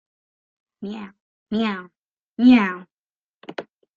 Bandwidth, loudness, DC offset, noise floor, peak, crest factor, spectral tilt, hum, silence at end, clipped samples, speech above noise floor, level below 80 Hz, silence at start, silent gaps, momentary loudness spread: 6.8 kHz; -19 LUFS; under 0.1%; under -90 dBFS; -4 dBFS; 20 dB; -7 dB/octave; none; 0.35 s; under 0.1%; over 71 dB; -62 dBFS; 0.8 s; 1.20-1.46 s, 1.98-2.32 s, 2.92-3.13 s, 3.22-3.41 s; 22 LU